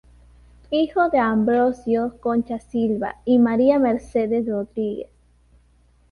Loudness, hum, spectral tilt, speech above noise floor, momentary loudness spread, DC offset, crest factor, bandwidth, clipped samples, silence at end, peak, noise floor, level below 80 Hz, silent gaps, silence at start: -21 LUFS; none; -7.5 dB/octave; 37 dB; 9 LU; under 0.1%; 16 dB; 6.6 kHz; under 0.1%; 1.05 s; -4 dBFS; -57 dBFS; -52 dBFS; none; 0.7 s